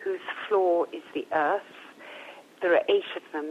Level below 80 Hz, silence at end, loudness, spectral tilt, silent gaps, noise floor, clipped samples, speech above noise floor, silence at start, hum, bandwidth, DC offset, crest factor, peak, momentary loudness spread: -82 dBFS; 0 s; -27 LUFS; -4.5 dB/octave; none; -46 dBFS; under 0.1%; 20 dB; 0 s; none; 10.5 kHz; under 0.1%; 18 dB; -10 dBFS; 20 LU